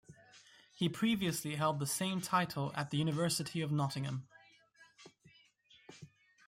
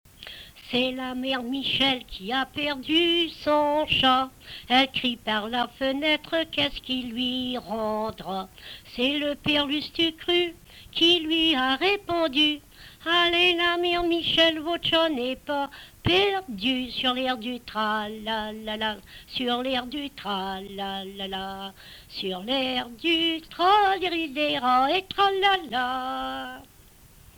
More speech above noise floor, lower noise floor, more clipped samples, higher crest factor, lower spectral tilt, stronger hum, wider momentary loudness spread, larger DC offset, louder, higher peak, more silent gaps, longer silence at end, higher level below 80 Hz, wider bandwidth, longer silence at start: first, 31 dB vs 27 dB; first, -67 dBFS vs -52 dBFS; neither; about the same, 18 dB vs 16 dB; about the same, -4.5 dB/octave vs -4 dB/octave; neither; about the same, 12 LU vs 13 LU; neither; second, -36 LUFS vs -24 LUFS; second, -18 dBFS vs -10 dBFS; neither; second, 0.4 s vs 0.75 s; second, -74 dBFS vs -52 dBFS; second, 16 kHz vs over 20 kHz; about the same, 0.1 s vs 0.2 s